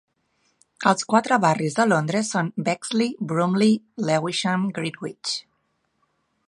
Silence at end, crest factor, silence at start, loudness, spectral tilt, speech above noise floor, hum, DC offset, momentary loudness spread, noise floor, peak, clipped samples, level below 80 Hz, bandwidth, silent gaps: 1.05 s; 22 dB; 0.8 s; -22 LUFS; -5 dB/octave; 49 dB; none; under 0.1%; 9 LU; -71 dBFS; -2 dBFS; under 0.1%; -70 dBFS; 11 kHz; none